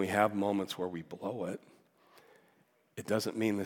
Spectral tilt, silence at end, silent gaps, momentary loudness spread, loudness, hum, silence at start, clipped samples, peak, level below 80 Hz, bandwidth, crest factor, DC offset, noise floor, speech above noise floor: -5.5 dB/octave; 0 s; none; 16 LU; -34 LUFS; none; 0 s; under 0.1%; -12 dBFS; -82 dBFS; 18 kHz; 24 dB; under 0.1%; -70 dBFS; 36 dB